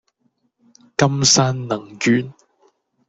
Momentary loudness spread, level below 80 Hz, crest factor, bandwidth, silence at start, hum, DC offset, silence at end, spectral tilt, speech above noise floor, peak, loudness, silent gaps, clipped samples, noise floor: 13 LU; -56 dBFS; 20 dB; 8.4 kHz; 1 s; none; under 0.1%; 0.75 s; -3.5 dB/octave; 49 dB; -2 dBFS; -17 LUFS; none; under 0.1%; -67 dBFS